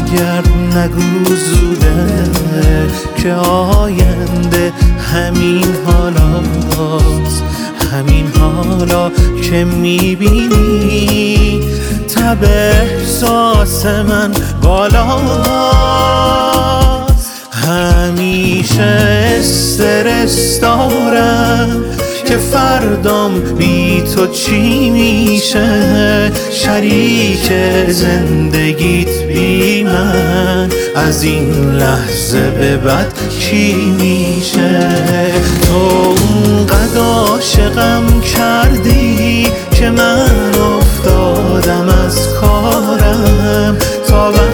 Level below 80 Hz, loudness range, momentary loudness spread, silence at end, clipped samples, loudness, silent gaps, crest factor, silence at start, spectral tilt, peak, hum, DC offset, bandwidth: -16 dBFS; 2 LU; 4 LU; 0 s; under 0.1%; -11 LUFS; none; 10 dB; 0 s; -5 dB/octave; 0 dBFS; none; under 0.1%; over 20 kHz